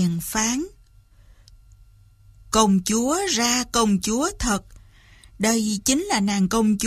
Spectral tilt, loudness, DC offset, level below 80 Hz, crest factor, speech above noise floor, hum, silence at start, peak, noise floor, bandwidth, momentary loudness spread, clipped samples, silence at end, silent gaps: -3.5 dB/octave; -21 LUFS; under 0.1%; -44 dBFS; 20 dB; 31 dB; none; 0 s; -4 dBFS; -52 dBFS; 15.5 kHz; 6 LU; under 0.1%; 0 s; none